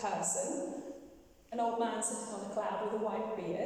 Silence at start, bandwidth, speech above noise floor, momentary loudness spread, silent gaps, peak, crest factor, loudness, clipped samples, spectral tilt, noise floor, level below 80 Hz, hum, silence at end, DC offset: 0 s; 16 kHz; 22 dB; 10 LU; none; -20 dBFS; 16 dB; -36 LUFS; under 0.1%; -3.5 dB/octave; -57 dBFS; -72 dBFS; none; 0 s; under 0.1%